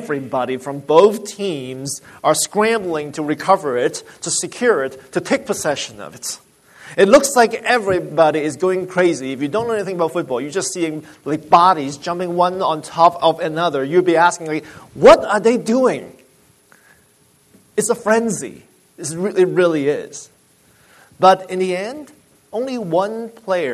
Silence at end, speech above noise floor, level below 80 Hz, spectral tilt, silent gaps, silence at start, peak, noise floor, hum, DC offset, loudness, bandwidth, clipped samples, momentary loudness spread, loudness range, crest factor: 0 s; 38 dB; -54 dBFS; -4 dB/octave; none; 0 s; 0 dBFS; -55 dBFS; none; under 0.1%; -17 LUFS; 13.5 kHz; under 0.1%; 14 LU; 5 LU; 18 dB